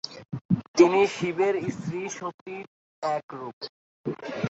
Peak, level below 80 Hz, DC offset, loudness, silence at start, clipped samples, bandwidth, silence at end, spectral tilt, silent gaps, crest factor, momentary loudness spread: -4 dBFS; -64 dBFS; under 0.1%; -26 LUFS; 0.05 s; under 0.1%; 8 kHz; 0 s; -5.5 dB/octave; 0.41-0.49 s, 0.68-0.74 s, 2.34-2.46 s, 2.67-3.02 s, 3.23-3.29 s, 3.53-3.61 s, 3.69-4.04 s; 22 dB; 20 LU